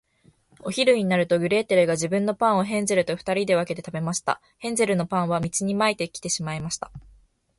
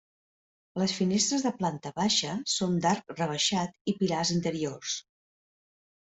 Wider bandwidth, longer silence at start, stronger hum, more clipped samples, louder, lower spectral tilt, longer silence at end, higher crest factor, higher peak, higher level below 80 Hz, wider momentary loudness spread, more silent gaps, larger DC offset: first, 11.5 kHz vs 8.2 kHz; about the same, 0.65 s vs 0.75 s; neither; neither; first, -24 LUFS vs -29 LUFS; about the same, -4.5 dB/octave vs -4 dB/octave; second, 0.6 s vs 1.1 s; about the same, 18 dB vs 18 dB; first, -6 dBFS vs -12 dBFS; first, -58 dBFS vs -66 dBFS; about the same, 9 LU vs 7 LU; second, none vs 3.81-3.85 s; neither